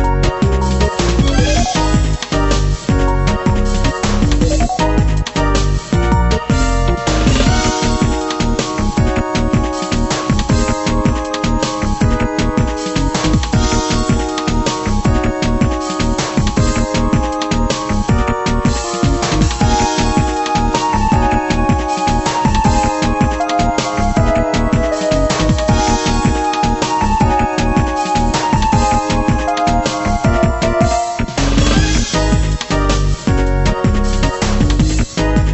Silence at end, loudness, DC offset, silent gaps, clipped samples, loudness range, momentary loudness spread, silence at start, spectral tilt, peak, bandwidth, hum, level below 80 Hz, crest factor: 0 s; -15 LUFS; under 0.1%; none; under 0.1%; 1 LU; 3 LU; 0 s; -5 dB/octave; 0 dBFS; 8.4 kHz; none; -18 dBFS; 14 dB